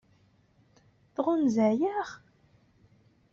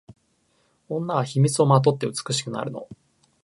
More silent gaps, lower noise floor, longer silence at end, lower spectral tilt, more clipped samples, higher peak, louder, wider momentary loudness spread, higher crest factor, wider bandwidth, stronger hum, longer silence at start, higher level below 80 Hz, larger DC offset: neither; about the same, -65 dBFS vs -66 dBFS; first, 1.15 s vs 0.5 s; about the same, -6.5 dB/octave vs -5.5 dB/octave; neither; second, -14 dBFS vs -2 dBFS; second, -28 LUFS vs -23 LUFS; about the same, 16 LU vs 15 LU; about the same, 18 dB vs 22 dB; second, 7.4 kHz vs 11.5 kHz; neither; first, 1.2 s vs 0.1 s; second, -72 dBFS vs -66 dBFS; neither